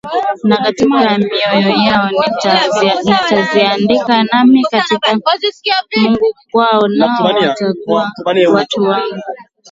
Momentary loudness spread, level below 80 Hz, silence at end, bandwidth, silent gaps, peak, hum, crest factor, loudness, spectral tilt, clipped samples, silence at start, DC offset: 4 LU; -52 dBFS; 0.3 s; 7.8 kHz; none; 0 dBFS; none; 12 dB; -12 LUFS; -5 dB/octave; under 0.1%; 0.05 s; under 0.1%